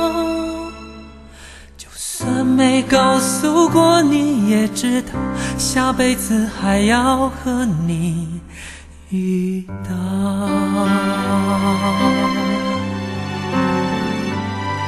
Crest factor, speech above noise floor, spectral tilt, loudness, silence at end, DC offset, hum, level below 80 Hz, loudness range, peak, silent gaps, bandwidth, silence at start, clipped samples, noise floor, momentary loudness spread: 18 dB; 22 dB; -5 dB/octave; -17 LUFS; 0 s; under 0.1%; none; -40 dBFS; 6 LU; 0 dBFS; none; 13 kHz; 0 s; under 0.1%; -39 dBFS; 12 LU